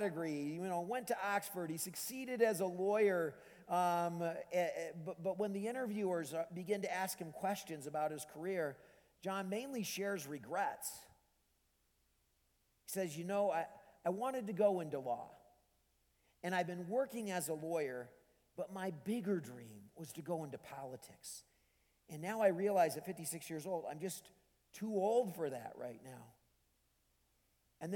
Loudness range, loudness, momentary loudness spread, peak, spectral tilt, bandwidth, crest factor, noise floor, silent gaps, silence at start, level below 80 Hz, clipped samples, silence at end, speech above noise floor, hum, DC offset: 7 LU; -40 LUFS; 15 LU; -20 dBFS; -5 dB/octave; 19 kHz; 20 dB; -79 dBFS; none; 0 s; -82 dBFS; under 0.1%; 0 s; 39 dB; none; under 0.1%